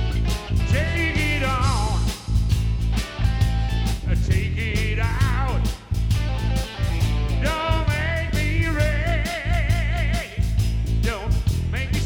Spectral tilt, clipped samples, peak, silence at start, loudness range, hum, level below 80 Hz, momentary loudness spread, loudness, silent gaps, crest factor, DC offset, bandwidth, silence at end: -5.5 dB/octave; under 0.1%; -8 dBFS; 0 s; 1 LU; none; -24 dBFS; 4 LU; -23 LUFS; none; 12 dB; under 0.1%; 16 kHz; 0 s